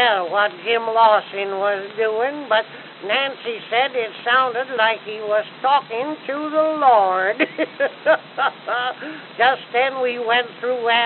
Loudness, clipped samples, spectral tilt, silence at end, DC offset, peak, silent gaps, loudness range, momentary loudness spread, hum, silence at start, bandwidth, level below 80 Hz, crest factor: -19 LUFS; under 0.1%; 0.5 dB/octave; 0 s; under 0.1%; -2 dBFS; none; 2 LU; 10 LU; none; 0 s; 4.5 kHz; under -90 dBFS; 18 dB